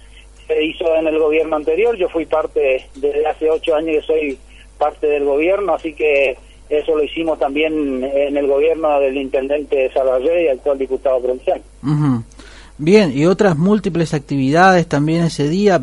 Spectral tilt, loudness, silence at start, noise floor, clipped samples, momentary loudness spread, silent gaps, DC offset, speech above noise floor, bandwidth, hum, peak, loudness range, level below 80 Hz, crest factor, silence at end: -6.5 dB/octave; -16 LUFS; 0.15 s; -40 dBFS; under 0.1%; 7 LU; none; under 0.1%; 24 dB; 11.5 kHz; none; 0 dBFS; 3 LU; -42 dBFS; 16 dB; 0 s